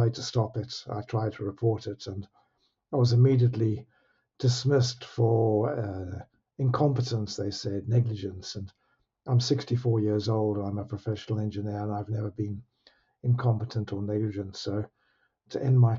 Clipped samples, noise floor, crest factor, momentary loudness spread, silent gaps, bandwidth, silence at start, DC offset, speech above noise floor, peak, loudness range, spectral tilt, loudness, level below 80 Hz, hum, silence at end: under 0.1%; -73 dBFS; 16 dB; 13 LU; none; 7.6 kHz; 0 s; under 0.1%; 46 dB; -12 dBFS; 5 LU; -7.5 dB/octave; -28 LUFS; -64 dBFS; none; 0 s